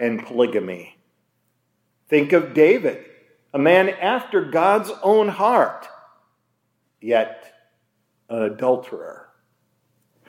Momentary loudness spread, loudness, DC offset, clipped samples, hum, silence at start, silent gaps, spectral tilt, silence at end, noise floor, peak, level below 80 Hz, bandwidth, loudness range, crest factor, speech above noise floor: 19 LU; -19 LUFS; under 0.1%; under 0.1%; none; 0 s; none; -6 dB/octave; 1.1 s; -71 dBFS; -2 dBFS; -80 dBFS; 16 kHz; 8 LU; 18 dB; 52 dB